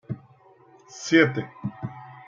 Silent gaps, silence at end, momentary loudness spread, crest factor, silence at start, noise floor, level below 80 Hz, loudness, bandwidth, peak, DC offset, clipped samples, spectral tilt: none; 0.05 s; 19 LU; 24 dB; 0.1 s; -55 dBFS; -68 dBFS; -23 LUFS; 7.6 kHz; -4 dBFS; under 0.1%; under 0.1%; -5.5 dB/octave